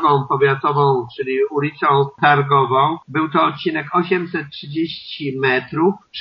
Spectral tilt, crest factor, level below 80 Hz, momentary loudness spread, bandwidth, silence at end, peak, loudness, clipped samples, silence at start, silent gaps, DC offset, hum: -4 dB/octave; 16 dB; -60 dBFS; 9 LU; 5.8 kHz; 0 s; -2 dBFS; -18 LUFS; under 0.1%; 0 s; none; under 0.1%; none